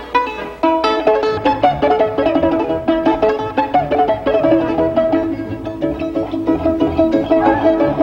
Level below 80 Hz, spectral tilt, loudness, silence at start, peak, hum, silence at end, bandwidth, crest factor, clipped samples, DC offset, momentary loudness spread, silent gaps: -38 dBFS; -7.5 dB/octave; -16 LUFS; 0 s; -2 dBFS; none; 0 s; 7 kHz; 14 dB; under 0.1%; under 0.1%; 7 LU; none